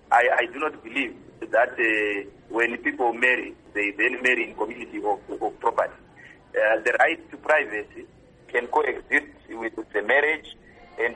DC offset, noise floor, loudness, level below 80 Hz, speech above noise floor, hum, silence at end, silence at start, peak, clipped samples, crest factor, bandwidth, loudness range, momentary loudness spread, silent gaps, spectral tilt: under 0.1%; -47 dBFS; -24 LUFS; -60 dBFS; 22 dB; none; 0 s; 0.1 s; -6 dBFS; under 0.1%; 20 dB; 11 kHz; 2 LU; 11 LU; none; -3.5 dB/octave